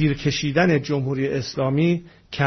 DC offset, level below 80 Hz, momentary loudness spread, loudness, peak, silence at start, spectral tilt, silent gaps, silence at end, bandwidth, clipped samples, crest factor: under 0.1%; -48 dBFS; 6 LU; -22 LUFS; -6 dBFS; 0 s; -6.5 dB/octave; none; 0 s; 6.4 kHz; under 0.1%; 14 dB